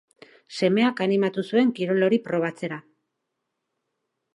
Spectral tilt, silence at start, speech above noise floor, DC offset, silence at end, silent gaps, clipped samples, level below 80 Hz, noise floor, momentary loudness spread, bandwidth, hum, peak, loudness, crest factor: -6.5 dB/octave; 0.5 s; 58 dB; under 0.1%; 1.55 s; none; under 0.1%; -76 dBFS; -80 dBFS; 12 LU; 11 kHz; none; -8 dBFS; -23 LUFS; 18 dB